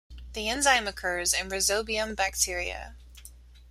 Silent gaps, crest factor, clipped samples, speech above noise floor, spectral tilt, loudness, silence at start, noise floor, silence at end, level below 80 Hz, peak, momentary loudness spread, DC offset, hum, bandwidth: none; 22 dB; under 0.1%; 22 dB; -1 dB/octave; -26 LUFS; 0.1 s; -50 dBFS; 0 s; -46 dBFS; -8 dBFS; 13 LU; under 0.1%; none; 16 kHz